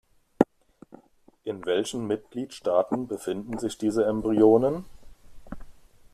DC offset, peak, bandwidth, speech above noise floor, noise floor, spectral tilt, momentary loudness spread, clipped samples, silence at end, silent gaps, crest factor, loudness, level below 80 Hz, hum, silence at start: under 0.1%; -4 dBFS; 14 kHz; 33 dB; -58 dBFS; -6 dB/octave; 19 LU; under 0.1%; 0.4 s; none; 24 dB; -26 LUFS; -54 dBFS; none; 0.4 s